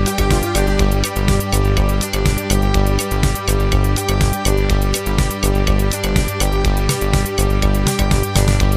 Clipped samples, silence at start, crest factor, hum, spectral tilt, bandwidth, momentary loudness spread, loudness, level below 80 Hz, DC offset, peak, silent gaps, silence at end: under 0.1%; 0 s; 14 dB; none; -5 dB/octave; 15.5 kHz; 2 LU; -17 LUFS; -18 dBFS; 0.7%; -2 dBFS; none; 0 s